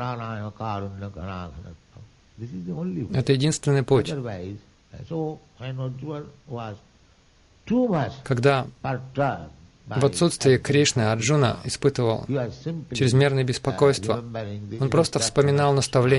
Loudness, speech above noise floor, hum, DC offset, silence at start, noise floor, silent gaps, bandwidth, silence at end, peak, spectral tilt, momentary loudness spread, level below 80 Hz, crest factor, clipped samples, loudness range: -24 LUFS; 34 dB; none; under 0.1%; 0 s; -57 dBFS; none; 11.5 kHz; 0 s; -6 dBFS; -5.5 dB/octave; 16 LU; -52 dBFS; 18 dB; under 0.1%; 9 LU